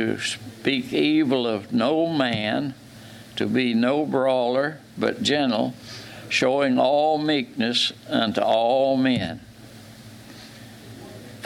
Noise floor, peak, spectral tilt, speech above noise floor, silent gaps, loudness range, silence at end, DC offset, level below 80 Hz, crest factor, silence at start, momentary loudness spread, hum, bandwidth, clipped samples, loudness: -44 dBFS; -6 dBFS; -5 dB/octave; 22 dB; none; 3 LU; 0 s; under 0.1%; -62 dBFS; 18 dB; 0 s; 22 LU; none; 14.5 kHz; under 0.1%; -22 LUFS